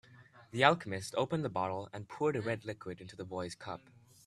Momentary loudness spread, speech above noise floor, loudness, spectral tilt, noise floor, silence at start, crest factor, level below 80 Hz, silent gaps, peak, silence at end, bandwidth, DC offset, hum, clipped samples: 18 LU; 24 dB; -35 LUFS; -5 dB/octave; -59 dBFS; 0.1 s; 28 dB; -72 dBFS; none; -8 dBFS; 0.45 s; 13.5 kHz; under 0.1%; none; under 0.1%